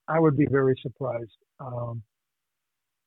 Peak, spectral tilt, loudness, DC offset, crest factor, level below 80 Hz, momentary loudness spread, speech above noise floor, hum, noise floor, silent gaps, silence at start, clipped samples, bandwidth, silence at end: -10 dBFS; -11.5 dB/octave; -26 LUFS; under 0.1%; 18 dB; -64 dBFS; 20 LU; 59 dB; none; -85 dBFS; none; 0.1 s; under 0.1%; 4.1 kHz; 1.05 s